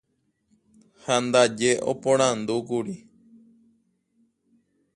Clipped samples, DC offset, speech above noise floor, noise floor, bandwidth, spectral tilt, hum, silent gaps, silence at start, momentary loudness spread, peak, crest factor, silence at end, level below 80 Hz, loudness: under 0.1%; under 0.1%; 49 dB; -72 dBFS; 11.5 kHz; -3.5 dB/octave; none; none; 1.05 s; 15 LU; -6 dBFS; 22 dB; 1.95 s; -68 dBFS; -23 LUFS